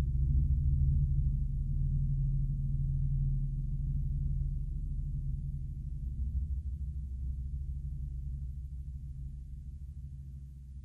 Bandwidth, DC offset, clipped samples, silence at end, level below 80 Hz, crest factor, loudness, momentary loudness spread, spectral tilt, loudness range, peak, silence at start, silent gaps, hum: 0.7 kHz; under 0.1%; under 0.1%; 0 s; -34 dBFS; 14 dB; -36 LUFS; 15 LU; -11.5 dB/octave; 9 LU; -18 dBFS; 0 s; none; none